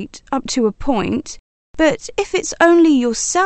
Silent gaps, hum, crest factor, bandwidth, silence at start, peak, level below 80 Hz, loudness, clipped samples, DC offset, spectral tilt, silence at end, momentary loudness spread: 1.39-1.74 s; none; 16 dB; 8.8 kHz; 0 s; 0 dBFS; -40 dBFS; -16 LUFS; under 0.1%; under 0.1%; -3.5 dB/octave; 0 s; 13 LU